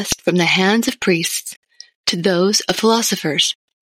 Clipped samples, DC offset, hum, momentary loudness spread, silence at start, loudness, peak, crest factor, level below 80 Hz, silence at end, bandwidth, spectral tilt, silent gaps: under 0.1%; under 0.1%; none; 7 LU; 0 s; -16 LUFS; -4 dBFS; 14 dB; -52 dBFS; 0.3 s; 17 kHz; -3 dB/octave; 1.56-1.62 s, 1.95-2.04 s